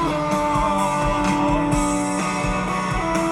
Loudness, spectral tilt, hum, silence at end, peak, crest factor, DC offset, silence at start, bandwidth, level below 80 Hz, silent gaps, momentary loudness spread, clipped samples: -21 LUFS; -5 dB/octave; none; 0 s; -8 dBFS; 14 dB; under 0.1%; 0 s; 15.5 kHz; -32 dBFS; none; 3 LU; under 0.1%